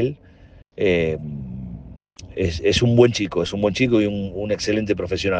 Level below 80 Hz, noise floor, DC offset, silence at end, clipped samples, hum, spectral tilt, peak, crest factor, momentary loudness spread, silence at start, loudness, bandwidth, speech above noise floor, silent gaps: -44 dBFS; -48 dBFS; under 0.1%; 0 s; under 0.1%; none; -6 dB/octave; -2 dBFS; 18 dB; 18 LU; 0 s; -20 LUFS; 9.2 kHz; 28 dB; none